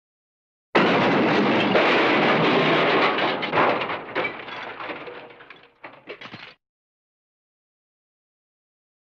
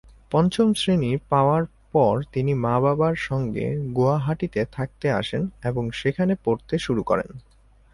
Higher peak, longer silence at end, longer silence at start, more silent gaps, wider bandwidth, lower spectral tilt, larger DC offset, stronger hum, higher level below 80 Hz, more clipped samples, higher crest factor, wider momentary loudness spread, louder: about the same, -6 dBFS vs -6 dBFS; first, 2.6 s vs 0.55 s; first, 0.75 s vs 0.3 s; neither; second, 8.2 kHz vs 11.5 kHz; about the same, -6 dB/octave vs -7 dB/octave; neither; neither; second, -66 dBFS vs -48 dBFS; neither; about the same, 18 dB vs 16 dB; first, 21 LU vs 7 LU; first, -20 LUFS vs -23 LUFS